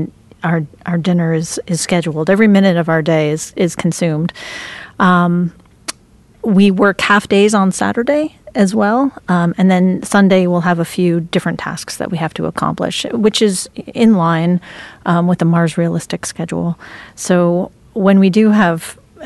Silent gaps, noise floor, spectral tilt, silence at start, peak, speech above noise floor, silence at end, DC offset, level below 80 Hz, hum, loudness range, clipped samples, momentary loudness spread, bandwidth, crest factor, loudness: none; -47 dBFS; -6 dB/octave; 0 s; -2 dBFS; 33 dB; 0 s; under 0.1%; -50 dBFS; none; 3 LU; under 0.1%; 12 LU; 12.5 kHz; 12 dB; -14 LUFS